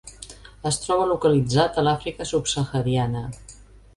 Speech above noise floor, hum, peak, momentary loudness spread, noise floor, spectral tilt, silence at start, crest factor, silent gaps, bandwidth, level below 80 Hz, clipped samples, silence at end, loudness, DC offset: 25 dB; none; -6 dBFS; 19 LU; -47 dBFS; -5 dB/octave; 0.05 s; 18 dB; none; 11.5 kHz; -46 dBFS; under 0.1%; 0.35 s; -23 LUFS; under 0.1%